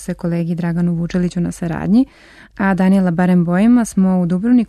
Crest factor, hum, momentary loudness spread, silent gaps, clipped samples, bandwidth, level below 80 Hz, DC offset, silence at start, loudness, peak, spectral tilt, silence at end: 10 dB; none; 8 LU; none; under 0.1%; 12 kHz; -42 dBFS; under 0.1%; 0 s; -16 LUFS; -6 dBFS; -8 dB/octave; 0.05 s